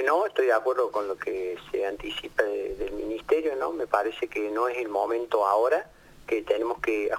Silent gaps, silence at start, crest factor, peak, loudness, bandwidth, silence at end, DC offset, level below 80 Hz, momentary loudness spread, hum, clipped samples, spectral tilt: none; 0 s; 18 dB; -8 dBFS; -27 LUFS; 16.5 kHz; 0 s; under 0.1%; -54 dBFS; 9 LU; none; under 0.1%; -4 dB/octave